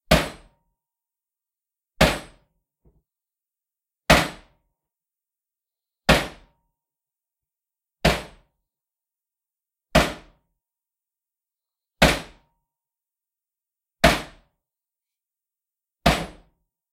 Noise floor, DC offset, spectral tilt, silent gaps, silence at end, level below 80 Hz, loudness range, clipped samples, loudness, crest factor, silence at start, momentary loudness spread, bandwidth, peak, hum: -89 dBFS; under 0.1%; -4 dB/octave; none; 0.6 s; -38 dBFS; 5 LU; under 0.1%; -21 LUFS; 24 dB; 0.1 s; 15 LU; 16 kHz; -2 dBFS; none